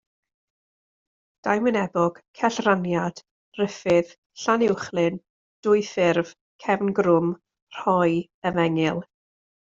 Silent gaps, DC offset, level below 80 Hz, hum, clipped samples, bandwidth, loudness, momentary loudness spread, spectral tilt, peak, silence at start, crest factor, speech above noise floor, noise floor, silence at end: 2.28-2.34 s, 3.31-3.52 s, 4.18-4.30 s, 5.30-5.63 s, 6.41-6.59 s, 7.62-7.67 s, 8.34-8.42 s; under 0.1%; -64 dBFS; none; under 0.1%; 7.6 kHz; -23 LUFS; 12 LU; -6 dB/octave; -4 dBFS; 1.45 s; 20 dB; over 68 dB; under -90 dBFS; 0.55 s